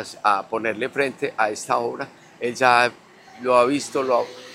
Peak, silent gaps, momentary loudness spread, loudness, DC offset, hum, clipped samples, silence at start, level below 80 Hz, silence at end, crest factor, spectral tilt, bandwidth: 0 dBFS; none; 12 LU; -21 LUFS; under 0.1%; none; under 0.1%; 0 s; -74 dBFS; 0 s; 22 dB; -3.5 dB/octave; 15.5 kHz